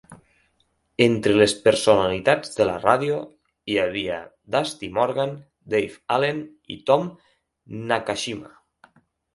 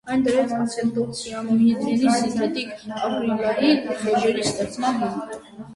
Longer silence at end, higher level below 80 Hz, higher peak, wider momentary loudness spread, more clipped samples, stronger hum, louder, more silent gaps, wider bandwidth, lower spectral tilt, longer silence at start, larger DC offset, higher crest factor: first, 0.9 s vs 0 s; about the same, -56 dBFS vs -58 dBFS; first, 0 dBFS vs -6 dBFS; first, 17 LU vs 10 LU; neither; neither; about the same, -22 LUFS vs -22 LUFS; neither; about the same, 11.5 kHz vs 11.5 kHz; about the same, -4.5 dB/octave vs -5 dB/octave; about the same, 0.1 s vs 0.05 s; neither; first, 22 dB vs 16 dB